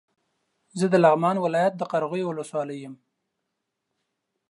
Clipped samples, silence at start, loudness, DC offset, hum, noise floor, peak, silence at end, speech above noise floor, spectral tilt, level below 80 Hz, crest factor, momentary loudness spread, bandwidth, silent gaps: under 0.1%; 0.75 s; -23 LUFS; under 0.1%; none; -81 dBFS; -6 dBFS; 1.55 s; 58 dB; -6.5 dB/octave; -78 dBFS; 22 dB; 18 LU; 11.5 kHz; none